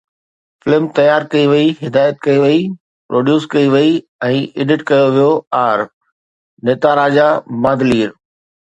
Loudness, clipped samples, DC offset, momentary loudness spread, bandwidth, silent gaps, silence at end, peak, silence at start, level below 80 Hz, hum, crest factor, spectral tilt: -13 LUFS; under 0.1%; under 0.1%; 7 LU; 8.4 kHz; 2.80-3.09 s, 4.09-4.19 s, 5.47-5.51 s, 5.93-6.01 s, 6.12-6.57 s; 0.6 s; 0 dBFS; 0.65 s; -54 dBFS; none; 14 dB; -7 dB/octave